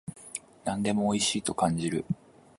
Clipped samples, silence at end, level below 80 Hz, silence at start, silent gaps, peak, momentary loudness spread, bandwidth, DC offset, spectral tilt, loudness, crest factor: under 0.1%; 0.45 s; -58 dBFS; 0.05 s; none; -10 dBFS; 13 LU; 11.5 kHz; under 0.1%; -4.5 dB/octave; -29 LUFS; 20 dB